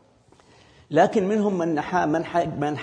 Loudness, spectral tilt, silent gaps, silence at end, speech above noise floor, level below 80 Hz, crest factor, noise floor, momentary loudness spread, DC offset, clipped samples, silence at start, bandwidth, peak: -23 LUFS; -6.5 dB/octave; none; 0 s; 34 dB; -58 dBFS; 16 dB; -56 dBFS; 5 LU; under 0.1%; under 0.1%; 0.9 s; 10 kHz; -6 dBFS